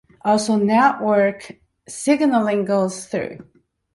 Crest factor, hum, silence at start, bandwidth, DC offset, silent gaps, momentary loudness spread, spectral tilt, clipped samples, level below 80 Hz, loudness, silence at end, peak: 16 dB; none; 0.25 s; 11.5 kHz; under 0.1%; none; 11 LU; -5 dB/octave; under 0.1%; -60 dBFS; -19 LUFS; 0.5 s; -2 dBFS